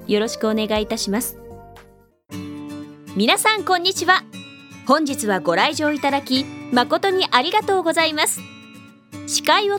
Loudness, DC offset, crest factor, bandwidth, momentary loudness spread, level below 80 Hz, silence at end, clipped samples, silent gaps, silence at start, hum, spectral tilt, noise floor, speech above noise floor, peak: -19 LUFS; under 0.1%; 20 dB; 19 kHz; 19 LU; -54 dBFS; 0 s; under 0.1%; none; 0 s; none; -2.5 dB/octave; -51 dBFS; 32 dB; 0 dBFS